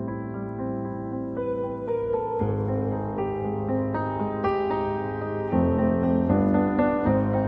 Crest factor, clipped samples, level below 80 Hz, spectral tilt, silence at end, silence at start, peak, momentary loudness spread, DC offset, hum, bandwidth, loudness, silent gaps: 18 dB; under 0.1%; -46 dBFS; -11 dB/octave; 0 s; 0 s; -8 dBFS; 9 LU; under 0.1%; none; 5.4 kHz; -26 LUFS; none